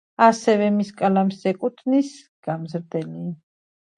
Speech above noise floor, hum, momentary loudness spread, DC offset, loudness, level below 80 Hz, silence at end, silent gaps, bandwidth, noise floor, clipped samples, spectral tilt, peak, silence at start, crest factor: over 69 dB; none; 15 LU; under 0.1%; -22 LUFS; -72 dBFS; 0.65 s; 2.28-2.43 s; 10.5 kHz; under -90 dBFS; under 0.1%; -6.5 dB/octave; 0 dBFS; 0.2 s; 22 dB